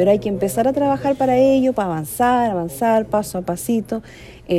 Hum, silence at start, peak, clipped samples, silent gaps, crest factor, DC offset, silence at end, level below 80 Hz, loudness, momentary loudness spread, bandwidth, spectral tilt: none; 0 s; -4 dBFS; under 0.1%; none; 16 dB; under 0.1%; 0 s; -46 dBFS; -19 LUFS; 8 LU; 16 kHz; -6 dB/octave